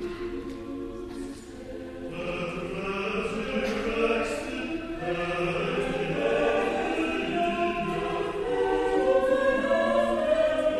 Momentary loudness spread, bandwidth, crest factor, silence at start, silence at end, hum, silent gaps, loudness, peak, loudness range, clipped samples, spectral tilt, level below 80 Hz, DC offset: 13 LU; 12.5 kHz; 16 dB; 0 s; 0 s; none; none; -27 LUFS; -12 dBFS; 7 LU; under 0.1%; -5.5 dB/octave; -48 dBFS; under 0.1%